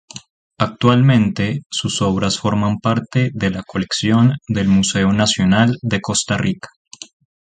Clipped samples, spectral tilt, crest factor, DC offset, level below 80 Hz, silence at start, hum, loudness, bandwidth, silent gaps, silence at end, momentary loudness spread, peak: under 0.1%; -5 dB/octave; 16 dB; under 0.1%; -42 dBFS; 0.15 s; none; -17 LUFS; 9.4 kHz; 0.30-0.50 s, 1.66-1.70 s, 6.76-6.85 s; 0.35 s; 11 LU; 0 dBFS